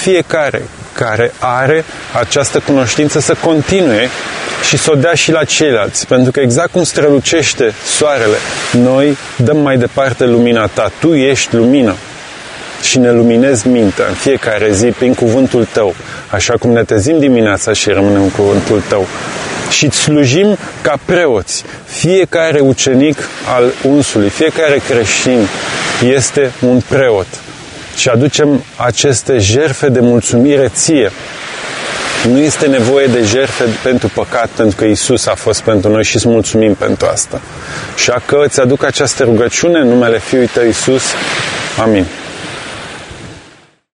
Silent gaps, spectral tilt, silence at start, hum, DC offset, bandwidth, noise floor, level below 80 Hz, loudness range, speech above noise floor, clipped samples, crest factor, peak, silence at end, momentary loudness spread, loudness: none; -4.5 dB/octave; 0 s; none; under 0.1%; 11 kHz; -42 dBFS; -42 dBFS; 2 LU; 31 dB; under 0.1%; 10 dB; 0 dBFS; 0.55 s; 9 LU; -10 LUFS